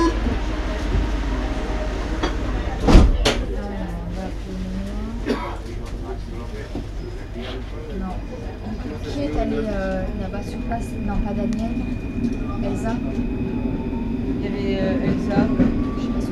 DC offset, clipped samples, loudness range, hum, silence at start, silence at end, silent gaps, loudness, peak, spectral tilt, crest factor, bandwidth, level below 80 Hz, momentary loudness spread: under 0.1%; under 0.1%; 8 LU; none; 0 s; 0 s; none; -24 LUFS; 0 dBFS; -6.5 dB/octave; 22 dB; 12 kHz; -26 dBFS; 11 LU